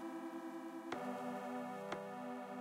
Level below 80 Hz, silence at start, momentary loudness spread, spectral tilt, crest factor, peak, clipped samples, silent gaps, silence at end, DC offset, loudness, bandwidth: -88 dBFS; 0 s; 4 LU; -5.5 dB/octave; 18 dB; -28 dBFS; under 0.1%; none; 0 s; under 0.1%; -46 LUFS; 16 kHz